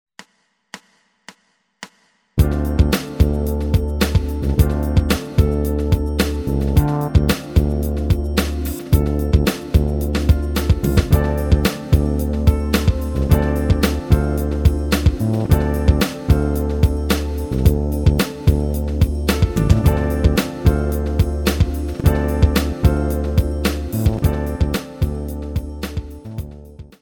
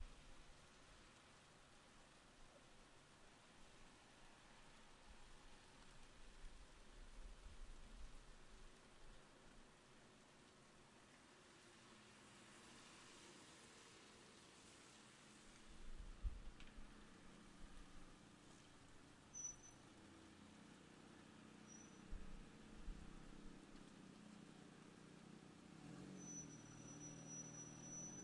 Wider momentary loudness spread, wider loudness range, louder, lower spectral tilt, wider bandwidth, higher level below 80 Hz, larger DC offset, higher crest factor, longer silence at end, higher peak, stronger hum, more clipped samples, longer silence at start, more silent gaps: second, 7 LU vs 12 LU; second, 3 LU vs 8 LU; first, -19 LUFS vs -62 LUFS; first, -6.5 dB/octave vs -3 dB/octave; first, 19.5 kHz vs 11 kHz; first, -22 dBFS vs -64 dBFS; neither; second, 18 dB vs 24 dB; first, 0.2 s vs 0 s; first, 0 dBFS vs -36 dBFS; neither; neither; first, 0.75 s vs 0 s; neither